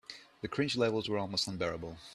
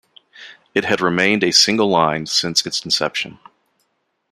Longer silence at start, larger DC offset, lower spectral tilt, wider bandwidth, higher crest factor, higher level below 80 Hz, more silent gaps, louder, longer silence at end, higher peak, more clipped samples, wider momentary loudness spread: second, 0.1 s vs 0.4 s; neither; first, -4.5 dB/octave vs -2.5 dB/octave; second, 13 kHz vs 15.5 kHz; about the same, 18 dB vs 18 dB; about the same, -64 dBFS vs -60 dBFS; neither; second, -34 LUFS vs -16 LUFS; second, 0 s vs 1 s; second, -18 dBFS vs 0 dBFS; neither; first, 13 LU vs 10 LU